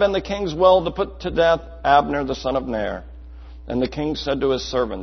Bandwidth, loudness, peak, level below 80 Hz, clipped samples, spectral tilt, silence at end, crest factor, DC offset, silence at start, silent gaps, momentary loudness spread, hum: 6.4 kHz; -21 LUFS; -2 dBFS; -38 dBFS; under 0.1%; -5.5 dB/octave; 0 s; 20 dB; under 0.1%; 0 s; none; 10 LU; none